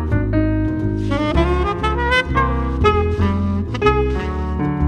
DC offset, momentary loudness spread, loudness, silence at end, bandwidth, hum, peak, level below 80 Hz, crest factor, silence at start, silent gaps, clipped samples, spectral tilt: under 0.1%; 5 LU; -18 LUFS; 0 s; 9.2 kHz; none; -2 dBFS; -24 dBFS; 16 dB; 0 s; none; under 0.1%; -7.5 dB/octave